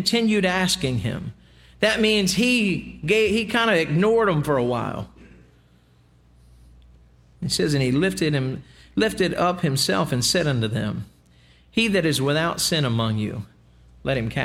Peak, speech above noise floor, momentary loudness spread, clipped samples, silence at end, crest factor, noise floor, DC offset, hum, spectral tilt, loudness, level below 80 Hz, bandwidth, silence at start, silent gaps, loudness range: -6 dBFS; 35 dB; 12 LU; under 0.1%; 0 s; 16 dB; -56 dBFS; under 0.1%; 60 Hz at -50 dBFS; -4.5 dB/octave; -21 LUFS; -48 dBFS; 16.5 kHz; 0 s; none; 6 LU